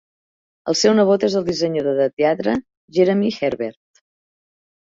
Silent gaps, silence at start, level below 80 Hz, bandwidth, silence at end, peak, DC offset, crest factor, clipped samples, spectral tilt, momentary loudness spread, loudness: 2.13-2.17 s, 2.77-2.88 s; 0.65 s; -58 dBFS; 7.8 kHz; 1.15 s; -2 dBFS; under 0.1%; 18 dB; under 0.1%; -5 dB/octave; 10 LU; -19 LUFS